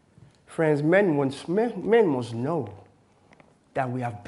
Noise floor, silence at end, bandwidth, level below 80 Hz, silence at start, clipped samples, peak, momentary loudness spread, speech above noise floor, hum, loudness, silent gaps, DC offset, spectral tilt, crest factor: -58 dBFS; 0 s; 11.5 kHz; -68 dBFS; 0.5 s; under 0.1%; -8 dBFS; 11 LU; 34 dB; none; -24 LUFS; none; under 0.1%; -7.5 dB/octave; 18 dB